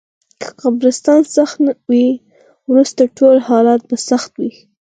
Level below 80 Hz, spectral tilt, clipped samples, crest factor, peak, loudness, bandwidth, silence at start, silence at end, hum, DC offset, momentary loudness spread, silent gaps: -66 dBFS; -4.5 dB/octave; under 0.1%; 14 dB; 0 dBFS; -13 LUFS; 9.4 kHz; 0.4 s; 0.35 s; none; under 0.1%; 14 LU; none